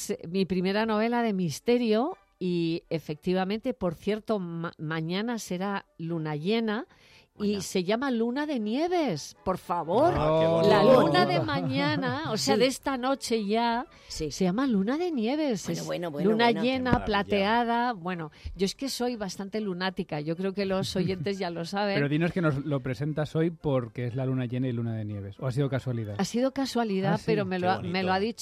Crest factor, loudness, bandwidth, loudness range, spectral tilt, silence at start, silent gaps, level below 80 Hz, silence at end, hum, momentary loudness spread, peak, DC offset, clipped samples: 18 dB; -28 LUFS; 15 kHz; 7 LU; -5.5 dB/octave; 0 s; none; -54 dBFS; 0 s; none; 9 LU; -10 dBFS; under 0.1%; under 0.1%